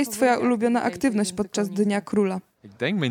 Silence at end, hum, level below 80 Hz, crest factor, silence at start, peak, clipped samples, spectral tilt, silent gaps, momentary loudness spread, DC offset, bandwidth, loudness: 0 s; none; -62 dBFS; 16 dB; 0 s; -8 dBFS; under 0.1%; -5 dB/octave; none; 6 LU; under 0.1%; 18 kHz; -23 LUFS